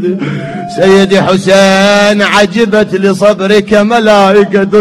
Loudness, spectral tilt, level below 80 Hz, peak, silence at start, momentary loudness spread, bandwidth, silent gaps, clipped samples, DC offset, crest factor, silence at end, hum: -7 LUFS; -5 dB/octave; -42 dBFS; 0 dBFS; 0 s; 7 LU; 13 kHz; none; 3%; under 0.1%; 8 dB; 0 s; none